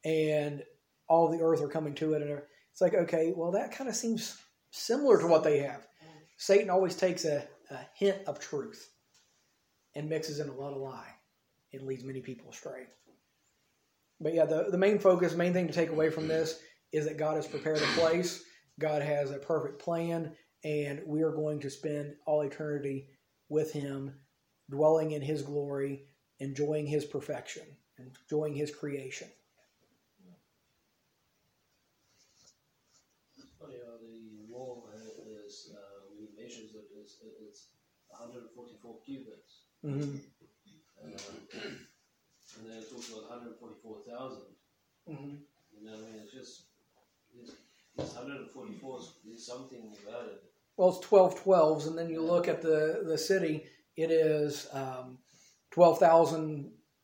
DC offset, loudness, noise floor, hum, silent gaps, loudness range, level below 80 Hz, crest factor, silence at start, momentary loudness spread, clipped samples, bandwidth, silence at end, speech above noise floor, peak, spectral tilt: under 0.1%; -31 LUFS; -76 dBFS; none; none; 21 LU; -80 dBFS; 24 dB; 0.05 s; 24 LU; under 0.1%; 16.5 kHz; 0.35 s; 45 dB; -10 dBFS; -5.5 dB/octave